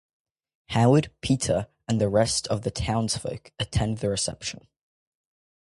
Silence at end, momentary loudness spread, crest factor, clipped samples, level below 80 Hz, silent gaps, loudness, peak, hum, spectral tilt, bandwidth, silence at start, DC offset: 1 s; 12 LU; 20 dB; under 0.1%; -44 dBFS; none; -25 LUFS; -6 dBFS; none; -5 dB/octave; 11.5 kHz; 0.7 s; under 0.1%